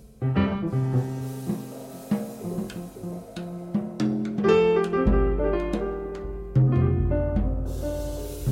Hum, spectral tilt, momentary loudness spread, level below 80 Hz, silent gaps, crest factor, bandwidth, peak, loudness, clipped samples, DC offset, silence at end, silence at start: none; -8 dB/octave; 14 LU; -34 dBFS; none; 18 dB; 16 kHz; -8 dBFS; -26 LUFS; under 0.1%; under 0.1%; 0 s; 0 s